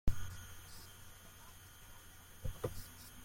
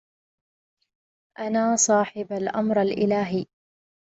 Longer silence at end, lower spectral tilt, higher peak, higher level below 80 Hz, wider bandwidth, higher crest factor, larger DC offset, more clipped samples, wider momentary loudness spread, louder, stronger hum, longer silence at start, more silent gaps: second, 0 s vs 0.75 s; about the same, -4.5 dB/octave vs -4 dB/octave; second, -20 dBFS vs -8 dBFS; first, -48 dBFS vs -66 dBFS; first, 16.5 kHz vs 8.2 kHz; about the same, 22 dB vs 18 dB; neither; neither; about the same, 12 LU vs 11 LU; second, -50 LUFS vs -23 LUFS; neither; second, 0.05 s vs 1.4 s; neither